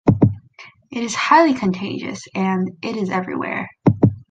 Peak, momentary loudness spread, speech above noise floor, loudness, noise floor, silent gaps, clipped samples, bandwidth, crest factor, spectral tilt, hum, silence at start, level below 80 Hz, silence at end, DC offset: -2 dBFS; 14 LU; 26 dB; -19 LUFS; -45 dBFS; none; under 0.1%; 9.2 kHz; 18 dB; -6.5 dB/octave; none; 0.05 s; -44 dBFS; 0.1 s; under 0.1%